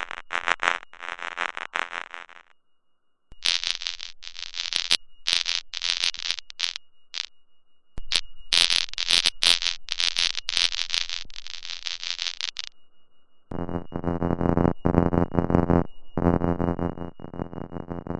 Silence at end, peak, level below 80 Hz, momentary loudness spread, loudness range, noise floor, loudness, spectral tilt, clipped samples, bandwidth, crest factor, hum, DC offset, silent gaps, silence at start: 0 s; 0 dBFS; -46 dBFS; 16 LU; 8 LU; -63 dBFS; -25 LUFS; -3.5 dB/octave; under 0.1%; 12 kHz; 26 dB; none; under 0.1%; none; 0 s